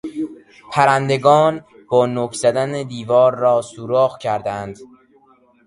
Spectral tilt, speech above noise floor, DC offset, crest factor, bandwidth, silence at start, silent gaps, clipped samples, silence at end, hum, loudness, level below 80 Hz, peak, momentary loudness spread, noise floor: -5.5 dB/octave; 37 dB; under 0.1%; 18 dB; 11.5 kHz; 0.05 s; none; under 0.1%; 0.8 s; none; -17 LUFS; -58 dBFS; 0 dBFS; 14 LU; -54 dBFS